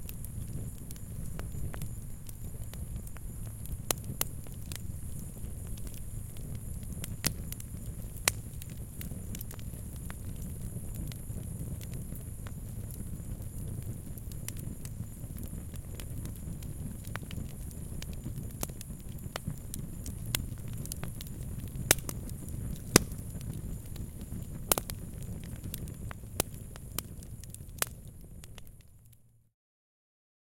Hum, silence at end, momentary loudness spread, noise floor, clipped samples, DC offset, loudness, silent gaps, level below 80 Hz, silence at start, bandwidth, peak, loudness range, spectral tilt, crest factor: none; 1.2 s; 12 LU; -60 dBFS; under 0.1%; under 0.1%; -38 LUFS; none; -44 dBFS; 0 s; 17 kHz; 0 dBFS; 9 LU; -3.5 dB/octave; 38 dB